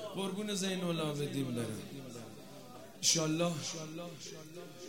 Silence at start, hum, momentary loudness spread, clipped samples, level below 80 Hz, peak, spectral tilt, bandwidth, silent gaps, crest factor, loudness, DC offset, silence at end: 0 s; none; 20 LU; under 0.1%; -74 dBFS; -14 dBFS; -3.5 dB/octave; 16 kHz; none; 24 dB; -35 LUFS; 0.1%; 0 s